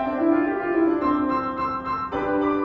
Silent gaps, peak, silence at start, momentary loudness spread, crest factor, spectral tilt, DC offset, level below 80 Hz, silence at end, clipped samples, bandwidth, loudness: none; -8 dBFS; 0 s; 5 LU; 14 dB; -8.5 dB/octave; under 0.1%; -50 dBFS; 0 s; under 0.1%; 5.8 kHz; -23 LUFS